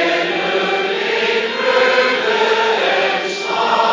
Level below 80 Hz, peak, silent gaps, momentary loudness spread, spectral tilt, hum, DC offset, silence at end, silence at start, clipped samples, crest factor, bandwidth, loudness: -66 dBFS; -2 dBFS; none; 4 LU; -3 dB/octave; none; under 0.1%; 0 s; 0 s; under 0.1%; 14 dB; 7.6 kHz; -15 LUFS